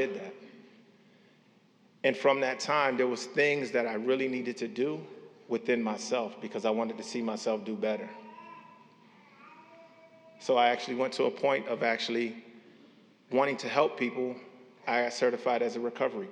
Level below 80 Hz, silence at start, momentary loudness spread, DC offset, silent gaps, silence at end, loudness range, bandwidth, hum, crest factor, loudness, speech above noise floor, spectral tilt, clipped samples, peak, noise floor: under -90 dBFS; 0 s; 14 LU; under 0.1%; none; 0 s; 6 LU; 10.5 kHz; none; 22 dB; -30 LUFS; 33 dB; -4 dB/octave; under 0.1%; -10 dBFS; -63 dBFS